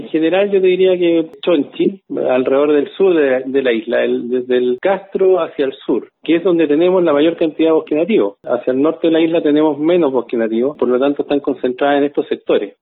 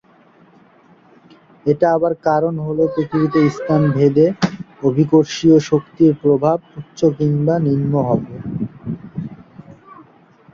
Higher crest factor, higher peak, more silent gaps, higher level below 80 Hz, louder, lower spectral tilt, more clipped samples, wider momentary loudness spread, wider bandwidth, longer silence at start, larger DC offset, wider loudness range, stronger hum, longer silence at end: about the same, 12 dB vs 16 dB; about the same, -2 dBFS vs -2 dBFS; neither; second, -64 dBFS vs -52 dBFS; about the same, -15 LUFS vs -17 LUFS; first, -10 dB/octave vs -8 dB/octave; neither; second, 6 LU vs 13 LU; second, 4.1 kHz vs 7.4 kHz; second, 0 s vs 1.65 s; neither; second, 2 LU vs 5 LU; neither; second, 0.1 s vs 0.5 s